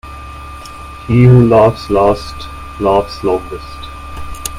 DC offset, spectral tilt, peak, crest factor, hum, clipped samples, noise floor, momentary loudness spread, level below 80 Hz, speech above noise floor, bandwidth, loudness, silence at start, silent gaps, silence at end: under 0.1%; -7.5 dB/octave; 0 dBFS; 14 dB; none; under 0.1%; -30 dBFS; 23 LU; -32 dBFS; 19 dB; 15 kHz; -11 LUFS; 0.05 s; none; 0 s